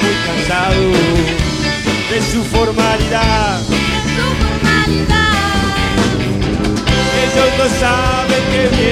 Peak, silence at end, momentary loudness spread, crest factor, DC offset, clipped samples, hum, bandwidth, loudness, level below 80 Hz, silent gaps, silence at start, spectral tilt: 0 dBFS; 0 s; 4 LU; 12 dB; under 0.1%; under 0.1%; none; 16 kHz; -13 LUFS; -24 dBFS; none; 0 s; -4.5 dB/octave